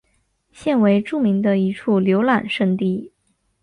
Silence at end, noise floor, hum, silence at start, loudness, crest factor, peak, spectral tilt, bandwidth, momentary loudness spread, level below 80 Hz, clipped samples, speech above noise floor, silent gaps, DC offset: 0.55 s; -66 dBFS; none; 0.6 s; -19 LUFS; 16 dB; -4 dBFS; -8 dB/octave; 10 kHz; 6 LU; -60 dBFS; under 0.1%; 48 dB; none; under 0.1%